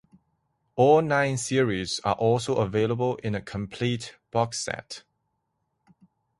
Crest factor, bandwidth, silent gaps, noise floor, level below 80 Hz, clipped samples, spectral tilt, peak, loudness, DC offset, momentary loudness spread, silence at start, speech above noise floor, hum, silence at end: 20 dB; 11.5 kHz; none; -77 dBFS; -56 dBFS; under 0.1%; -5 dB/octave; -8 dBFS; -25 LUFS; under 0.1%; 14 LU; 0.75 s; 52 dB; none; 1.4 s